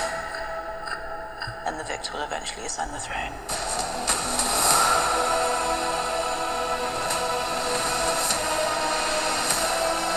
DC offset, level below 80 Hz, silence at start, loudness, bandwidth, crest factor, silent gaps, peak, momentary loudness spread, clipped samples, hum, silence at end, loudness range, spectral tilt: under 0.1%; -46 dBFS; 0 s; -25 LUFS; over 20 kHz; 24 dB; none; -2 dBFS; 11 LU; under 0.1%; none; 0 s; 8 LU; -1 dB/octave